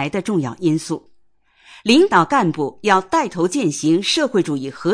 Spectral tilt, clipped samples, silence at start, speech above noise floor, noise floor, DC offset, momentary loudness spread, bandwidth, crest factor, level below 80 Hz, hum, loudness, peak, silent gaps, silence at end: -4.5 dB/octave; under 0.1%; 0 s; 39 dB; -56 dBFS; under 0.1%; 9 LU; 10.5 kHz; 16 dB; -58 dBFS; none; -18 LUFS; -2 dBFS; none; 0 s